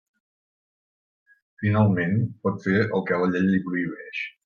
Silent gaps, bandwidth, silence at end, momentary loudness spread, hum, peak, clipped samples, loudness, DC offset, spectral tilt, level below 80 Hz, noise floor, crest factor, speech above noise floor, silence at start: none; 6.8 kHz; 0.15 s; 9 LU; none; -8 dBFS; under 0.1%; -24 LUFS; under 0.1%; -9 dB/octave; -62 dBFS; under -90 dBFS; 18 dB; over 67 dB; 1.6 s